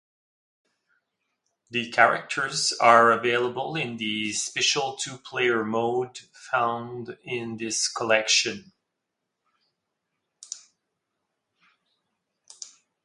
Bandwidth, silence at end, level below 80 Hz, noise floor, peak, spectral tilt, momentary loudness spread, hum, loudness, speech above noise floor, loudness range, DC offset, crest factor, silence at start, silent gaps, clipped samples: 11.5 kHz; 0.35 s; -74 dBFS; -82 dBFS; -2 dBFS; -2 dB/octave; 20 LU; none; -24 LUFS; 58 dB; 5 LU; under 0.1%; 24 dB; 1.7 s; none; under 0.1%